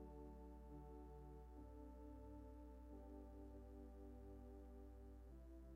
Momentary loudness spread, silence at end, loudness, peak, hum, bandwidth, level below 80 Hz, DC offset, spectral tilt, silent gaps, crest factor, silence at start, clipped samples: 2 LU; 0 s; -61 LUFS; -46 dBFS; 60 Hz at -60 dBFS; 15.5 kHz; -60 dBFS; under 0.1%; -9 dB/octave; none; 12 dB; 0 s; under 0.1%